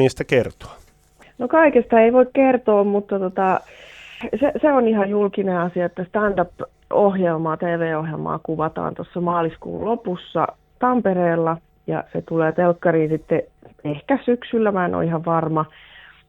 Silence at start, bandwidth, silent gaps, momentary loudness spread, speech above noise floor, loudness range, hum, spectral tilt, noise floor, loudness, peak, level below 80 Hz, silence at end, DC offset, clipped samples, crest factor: 0 s; 10 kHz; none; 12 LU; 33 dB; 5 LU; none; -8 dB/octave; -52 dBFS; -20 LUFS; -2 dBFS; -52 dBFS; 0.6 s; under 0.1%; under 0.1%; 18 dB